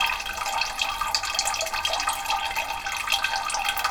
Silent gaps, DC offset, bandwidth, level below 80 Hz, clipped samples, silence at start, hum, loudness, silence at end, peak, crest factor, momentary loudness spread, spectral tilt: none; under 0.1%; over 20 kHz; -48 dBFS; under 0.1%; 0 s; none; -25 LUFS; 0 s; -4 dBFS; 22 dB; 4 LU; 1 dB/octave